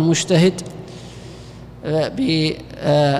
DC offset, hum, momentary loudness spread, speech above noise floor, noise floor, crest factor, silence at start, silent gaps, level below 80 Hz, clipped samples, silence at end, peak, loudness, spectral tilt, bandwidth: under 0.1%; 60 Hz at -40 dBFS; 21 LU; 20 dB; -37 dBFS; 14 dB; 0 s; none; -46 dBFS; under 0.1%; 0 s; -6 dBFS; -18 LUFS; -5.5 dB/octave; 12.5 kHz